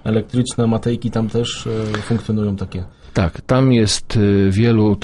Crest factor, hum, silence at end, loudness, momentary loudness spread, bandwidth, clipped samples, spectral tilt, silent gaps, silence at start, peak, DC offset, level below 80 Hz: 16 dB; none; 0 s; -18 LUFS; 8 LU; 11.5 kHz; under 0.1%; -6 dB/octave; none; 0.05 s; -2 dBFS; under 0.1%; -38 dBFS